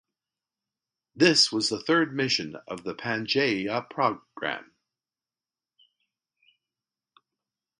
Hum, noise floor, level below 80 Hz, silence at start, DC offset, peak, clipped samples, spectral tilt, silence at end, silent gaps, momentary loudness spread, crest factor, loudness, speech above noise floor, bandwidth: none; under -90 dBFS; -72 dBFS; 1.15 s; under 0.1%; -4 dBFS; under 0.1%; -3.5 dB/octave; 3.15 s; none; 14 LU; 24 dB; -25 LUFS; over 64 dB; 11 kHz